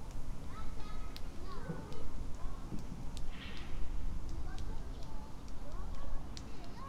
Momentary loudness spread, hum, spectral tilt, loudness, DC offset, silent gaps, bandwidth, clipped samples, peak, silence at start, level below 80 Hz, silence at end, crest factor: 4 LU; none; -5.5 dB/octave; -47 LUFS; under 0.1%; none; 8.6 kHz; under 0.1%; -22 dBFS; 0 s; -42 dBFS; 0 s; 12 dB